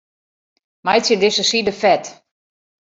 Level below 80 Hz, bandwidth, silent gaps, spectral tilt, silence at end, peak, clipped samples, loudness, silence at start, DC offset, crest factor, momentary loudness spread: -60 dBFS; 8 kHz; none; -2.5 dB/octave; 0.85 s; -2 dBFS; under 0.1%; -16 LUFS; 0.85 s; under 0.1%; 18 dB; 9 LU